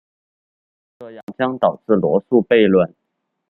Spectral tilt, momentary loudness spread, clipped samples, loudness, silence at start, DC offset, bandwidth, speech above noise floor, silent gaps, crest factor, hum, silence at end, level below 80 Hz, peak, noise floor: -9.5 dB/octave; 12 LU; under 0.1%; -17 LUFS; 1 s; under 0.1%; 4.2 kHz; 58 dB; 1.23-1.27 s; 18 dB; none; 0.6 s; -60 dBFS; -2 dBFS; -75 dBFS